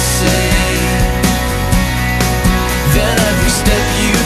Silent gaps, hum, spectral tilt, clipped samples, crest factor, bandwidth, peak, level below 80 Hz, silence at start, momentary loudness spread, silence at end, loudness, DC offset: none; none; -4 dB/octave; under 0.1%; 12 dB; 14 kHz; 0 dBFS; -18 dBFS; 0 s; 2 LU; 0 s; -13 LUFS; under 0.1%